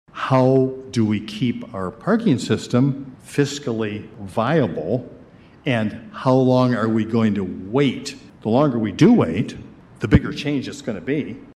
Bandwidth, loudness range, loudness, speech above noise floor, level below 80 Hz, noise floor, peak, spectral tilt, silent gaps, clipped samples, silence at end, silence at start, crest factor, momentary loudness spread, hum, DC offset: 12 kHz; 4 LU; -20 LUFS; 26 dB; -42 dBFS; -46 dBFS; -2 dBFS; -7 dB/octave; none; under 0.1%; 0.05 s; 0.15 s; 18 dB; 13 LU; none; under 0.1%